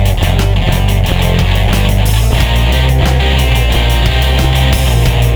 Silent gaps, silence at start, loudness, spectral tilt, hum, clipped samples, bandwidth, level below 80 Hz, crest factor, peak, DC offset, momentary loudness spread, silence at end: none; 0 s; -11 LUFS; -5 dB/octave; none; under 0.1%; over 20 kHz; -12 dBFS; 10 dB; 0 dBFS; under 0.1%; 1 LU; 0 s